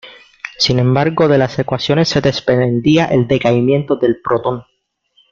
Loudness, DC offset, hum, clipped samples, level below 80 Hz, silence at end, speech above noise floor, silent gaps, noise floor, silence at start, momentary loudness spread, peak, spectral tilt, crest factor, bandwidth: -14 LUFS; under 0.1%; none; under 0.1%; -46 dBFS; 0.7 s; 44 dB; none; -58 dBFS; 0.05 s; 6 LU; 0 dBFS; -6.5 dB/octave; 14 dB; 7.4 kHz